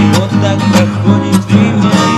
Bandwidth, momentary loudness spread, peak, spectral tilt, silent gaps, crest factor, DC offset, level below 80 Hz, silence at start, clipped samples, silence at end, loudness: 13.5 kHz; 2 LU; 0 dBFS; -6 dB/octave; none; 8 dB; under 0.1%; -40 dBFS; 0 s; 0.4%; 0 s; -10 LUFS